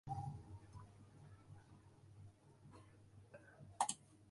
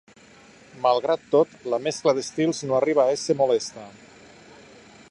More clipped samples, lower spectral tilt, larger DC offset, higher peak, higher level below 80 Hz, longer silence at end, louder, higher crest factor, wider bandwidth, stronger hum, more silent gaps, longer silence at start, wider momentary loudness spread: neither; about the same, -3.5 dB/octave vs -4.5 dB/octave; neither; second, -22 dBFS vs -6 dBFS; about the same, -70 dBFS vs -68 dBFS; second, 0 s vs 1.2 s; second, -48 LUFS vs -23 LUFS; first, 32 dB vs 18 dB; about the same, 11.5 kHz vs 11.5 kHz; neither; neither; second, 0.05 s vs 0.75 s; first, 22 LU vs 6 LU